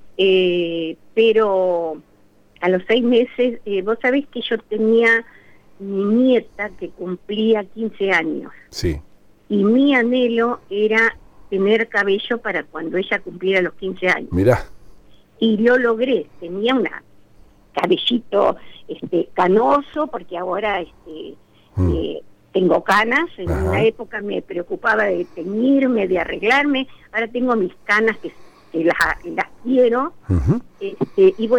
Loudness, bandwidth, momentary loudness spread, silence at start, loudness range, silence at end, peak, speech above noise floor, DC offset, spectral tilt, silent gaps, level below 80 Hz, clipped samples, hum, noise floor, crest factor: -19 LUFS; 16 kHz; 13 LU; 0 s; 3 LU; 0 s; -2 dBFS; 33 dB; under 0.1%; -6.5 dB/octave; none; -40 dBFS; under 0.1%; none; -51 dBFS; 16 dB